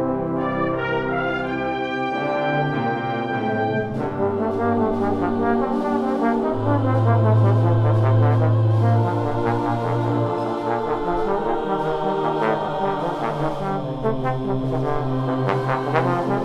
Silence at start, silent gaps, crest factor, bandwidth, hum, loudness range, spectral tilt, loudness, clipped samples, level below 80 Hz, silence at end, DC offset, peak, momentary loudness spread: 0 s; none; 16 dB; 6.2 kHz; none; 5 LU; -9 dB/octave; -21 LUFS; under 0.1%; -42 dBFS; 0 s; under 0.1%; -4 dBFS; 6 LU